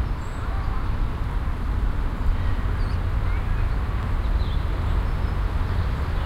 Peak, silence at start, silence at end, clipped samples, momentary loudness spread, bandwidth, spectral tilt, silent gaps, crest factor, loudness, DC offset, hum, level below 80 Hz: -10 dBFS; 0 s; 0 s; under 0.1%; 3 LU; 8.6 kHz; -7.5 dB/octave; none; 12 dB; -27 LUFS; under 0.1%; none; -24 dBFS